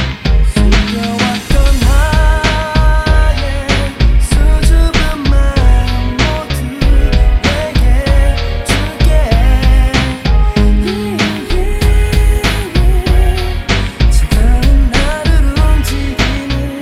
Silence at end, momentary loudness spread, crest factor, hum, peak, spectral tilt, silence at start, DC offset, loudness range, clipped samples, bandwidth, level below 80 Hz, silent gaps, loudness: 0 s; 4 LU; 10 dB; none; 0 dBFS; -5.5 dB/octave; 0 s; under 0.1%; 1 LU; under 0.1%; 14 kHz; -10 dBFS; none; -13 LUFS